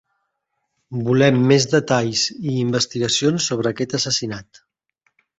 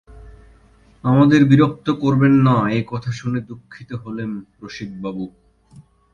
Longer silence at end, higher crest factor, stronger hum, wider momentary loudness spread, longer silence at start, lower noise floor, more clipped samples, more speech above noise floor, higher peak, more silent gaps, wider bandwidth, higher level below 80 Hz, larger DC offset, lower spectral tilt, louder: about the same, 0.95 s vs 0.85 s; about the same, 18 dB vs 18 dB; neither; second, 9 LU vs 20 LU; first, 0.9 s vs 0.15 s; first, -75 dBFS vs -51 dBFS; neither; first, 56 dB vs 34 dB; about the same, -2 dBFS vs 0 dBFS; neither; first, 8.2 kHz vs 7.2 kHz; second, -56 dBFS vs -48 dBFS; neither; second, -4.5 dB/octave vs -8 dB/octave; about the same, -18 LUFS vs -17 LUFS